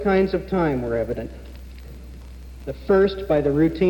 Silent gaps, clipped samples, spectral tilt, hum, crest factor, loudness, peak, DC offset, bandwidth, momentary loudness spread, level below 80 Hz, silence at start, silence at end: none; under 0.1%; -8.5 dB/octave; none; 16 dB; -21 LUFS; -8 dBFS; under 0.1%; 17.5 kHz; 22 LU; -38 dBFS; 0 s; 0 s